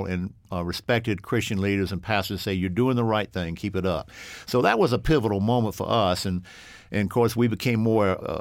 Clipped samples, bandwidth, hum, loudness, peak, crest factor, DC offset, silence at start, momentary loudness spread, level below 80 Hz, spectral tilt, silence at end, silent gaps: under 0.1%; 17 kHz; none; -25 LUFS; -6 dBFS; 18 dB; under 0.1%; 0 s; 10 LU; -46 dBFS; -6 dB/octave; 0 s; none